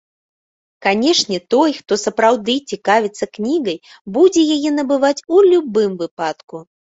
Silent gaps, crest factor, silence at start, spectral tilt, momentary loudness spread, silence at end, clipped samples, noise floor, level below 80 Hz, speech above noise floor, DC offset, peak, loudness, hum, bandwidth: 4.01-4.05 s, 6.11-6.17 s, 6.44-6.48 s; 14 dB; 0.8 s; -3.5 dB/octave; 12 LU; 0.3 s; under 0.1%; under -90 dBFS; -62 dBFS; over 74 dB; under 0.1%; -2 dBFS; -16 LUFS; none; 8 kHz